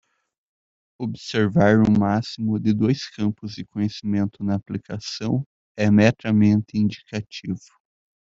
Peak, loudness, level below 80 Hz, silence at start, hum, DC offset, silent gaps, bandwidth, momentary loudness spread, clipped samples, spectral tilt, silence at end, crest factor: -2 dBFS; -22 LUFS; -54 dBFS; 1 s; none; under 0.1%; 5.46-5.75 s; 7.6 kHz; 15 LU; under 0.1%; -7 dB/octave; 0.7 s; 20 dB